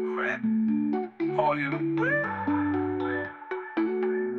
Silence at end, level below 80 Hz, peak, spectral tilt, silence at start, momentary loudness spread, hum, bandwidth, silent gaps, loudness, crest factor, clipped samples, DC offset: 0 s; -72 dBFS; -12 dBFS; -8.5 dB/octave; 0 s; 5 LU; none; 6.6 kHz; none; -28 LUFS; 16 dB; under 0.1%; under 0.1%